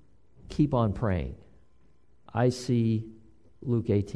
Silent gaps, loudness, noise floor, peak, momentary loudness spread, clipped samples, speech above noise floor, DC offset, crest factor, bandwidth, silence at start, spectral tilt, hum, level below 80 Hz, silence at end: none; -28 LUFS; -64 dBFS; -12 dBFS; 15 LU; under 0.1%; 38 dB; 0.2%; 16 dB; 11 kHz; 0.45 s; -8 dB/octave; none; -48 dBFS; 0 s